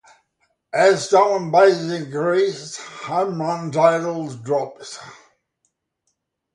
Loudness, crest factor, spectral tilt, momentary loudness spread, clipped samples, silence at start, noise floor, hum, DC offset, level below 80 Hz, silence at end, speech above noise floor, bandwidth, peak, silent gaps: -19 LUFS; 18 dB; -5 dB/octave; 17 LU; under 0.1%; 0.75 s; -74 dBFS; none; under 0.1%; -70 dBFS; 1.4 s; 55 dB; 11 kHz; -2 dBFS; none